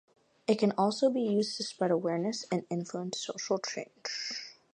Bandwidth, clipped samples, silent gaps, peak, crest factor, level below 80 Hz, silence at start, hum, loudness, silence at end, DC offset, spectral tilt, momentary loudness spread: 10.5 kHz; under 0.1%; none; -12 dBFS; 20 dB; -82 dBFS; 0.5 s; none; -32 LUFS; 0.25 s; under 0.1%; -4.5 dB/octave; 10 LU